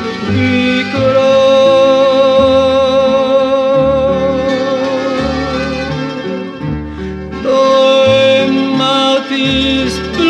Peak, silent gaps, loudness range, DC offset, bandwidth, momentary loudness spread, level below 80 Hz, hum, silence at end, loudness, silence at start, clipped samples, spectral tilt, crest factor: 0 dBFS; none; 6 LU; under 0.1%; 9 kHz; 12 LU; -34 dBFS; none; 0 s; -11 LUFS; 0 s; under 0.1%; -5.5 dB/octave; 10 dB